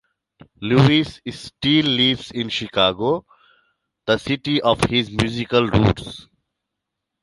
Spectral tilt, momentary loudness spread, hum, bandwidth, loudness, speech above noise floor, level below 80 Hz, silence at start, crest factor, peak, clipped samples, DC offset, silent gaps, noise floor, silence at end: -6 dB/octave; 15 LU; none; 11.5 kHz; -19 LUFS; 62 dB; -42 dBFS; 0.6 s; 20 dB; -2 dBFS; under 0.1%; under 0.1%; none; -81 dBFS; 1 s